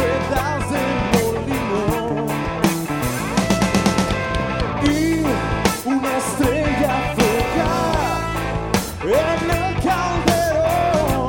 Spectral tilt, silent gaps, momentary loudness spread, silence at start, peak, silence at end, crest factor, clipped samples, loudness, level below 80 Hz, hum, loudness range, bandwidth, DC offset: -5 dB/octave; none; 4 LU; 0 s; 0 dBFS; 0 s; 18 dB; under 0.1%; -19 LUFS; -32 dBFS; none; 1 LU; 18 kHz; under 0.1%